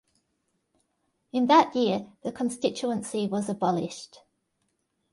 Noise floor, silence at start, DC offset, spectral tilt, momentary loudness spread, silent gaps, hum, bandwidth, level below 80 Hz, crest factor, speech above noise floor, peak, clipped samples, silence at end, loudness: -76 dBFS; 1.35 s; under 0.1%; -5 dB/octave; 13 LU; none; none; 11.5 kHz; -70 dBFS; 22 dB; 50 dB; -6 dBFS; under 0.1%; 1.1 s; -26 LUFS